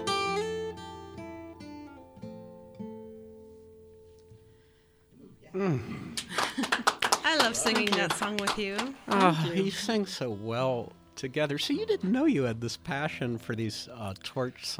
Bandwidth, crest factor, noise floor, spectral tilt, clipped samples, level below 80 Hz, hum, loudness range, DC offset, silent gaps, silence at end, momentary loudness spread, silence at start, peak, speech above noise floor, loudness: over 20 kHz; 26 dB; -62 dBFS; -4 dB/octave; under 0.1%; -62 dBFS; none; 20 LU; under 0.1%; none; 0 s; 20 LU; 0 s; -4 dBFS; 32 dB; -29 LUFS